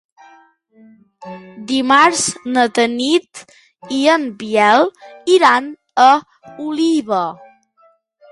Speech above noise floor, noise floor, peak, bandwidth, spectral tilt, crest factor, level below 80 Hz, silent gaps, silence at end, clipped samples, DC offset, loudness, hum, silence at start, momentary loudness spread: 40 dB; -55 dBFS; 0 dBFS; 11.5 kHz; -2.5 dB/octave; 16 dB; -64 dBFS; none; 0.95 s; under 0.1%; under 0.1%; -15 LUFS; none; 1.2 s; 15 LU